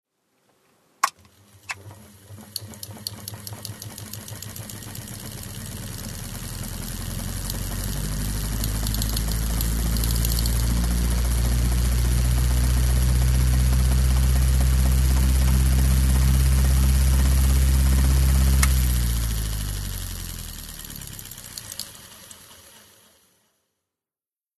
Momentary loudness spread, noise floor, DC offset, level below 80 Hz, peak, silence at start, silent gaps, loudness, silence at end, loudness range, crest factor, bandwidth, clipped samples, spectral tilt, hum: 15 LU; under -90 dBFS; under 0.1%; -24 dBFS; -2 dBFS; 1.05 s; none; -23 LUFS; 2.05 s; 15 LU; 20 dB; 13.5 kHz; under 0.1%; -4.5 dB/octave; none